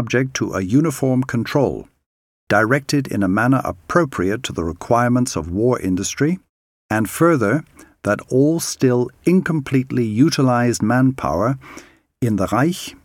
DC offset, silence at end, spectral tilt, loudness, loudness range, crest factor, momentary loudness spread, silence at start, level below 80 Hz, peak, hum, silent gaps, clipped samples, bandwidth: under 0.1%; 0.1 s; -6 dB/octave; -18 LUFS; 2 LU; 18 dB; 6 LU; 0 s; -46 dBFS; 0 dBFS; none; 2.06-2.47 s, 6.49-6.89 s; under 0.1%; 17.5 kHz